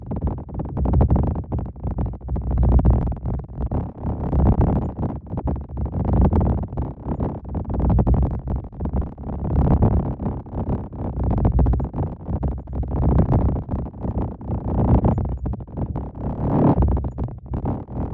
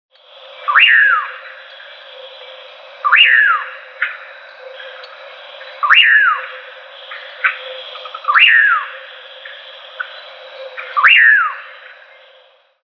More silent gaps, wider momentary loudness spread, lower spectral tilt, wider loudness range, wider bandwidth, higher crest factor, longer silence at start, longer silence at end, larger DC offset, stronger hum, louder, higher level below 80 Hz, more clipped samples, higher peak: neither; second, 11 LU vs 27 LU; first, -13 dB/octave vs 2 dB/octave; about the same, 2 LU vs 3 LU; second, 3 kHz vs 5.4 kHz; about the same, 18 dB vs 16 dB; second, 0 s vs 0.6 s; second, 0 s vs 1.2 s; neither; neither; second, -23 LUFS vs -10 LUFS; first, -26 dBFS vs -82 dBFS; neither; second, -4 dBFS vs 0 dBFS